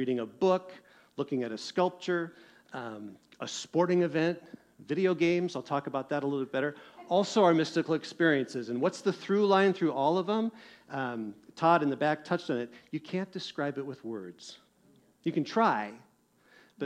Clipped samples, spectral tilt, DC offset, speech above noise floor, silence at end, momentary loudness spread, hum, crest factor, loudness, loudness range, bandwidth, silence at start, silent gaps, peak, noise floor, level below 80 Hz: under 0.1%; -6 dB/octave; under 0.1%; 34 dB; 0 s; 16 LU; none; 20 dB; -30 LUFS; 7 LU; 10 kHz; 0 s; none; -12 dBFS; -64 dBFS; -78 dBFS